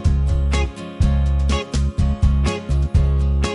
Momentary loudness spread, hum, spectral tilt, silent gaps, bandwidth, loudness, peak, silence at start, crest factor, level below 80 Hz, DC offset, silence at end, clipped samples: 4 LU; none; -6.5 dB/octave; none; 11 kHz; -20 LUFS; -4 dBFS; 0 s; 12 dB; -18 dBFS; under 0.1%; 0 s; under 0.1%